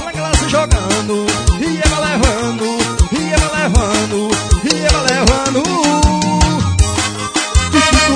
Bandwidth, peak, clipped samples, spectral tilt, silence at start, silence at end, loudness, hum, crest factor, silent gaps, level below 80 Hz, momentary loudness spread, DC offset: 10 kHz; 0 dBFS; under 0.1%; -4 dB/octave; 0 s; 0 s; -14 LUFS; none; 14 dB; none; -18 dBFS; 4 LU; under 0.1%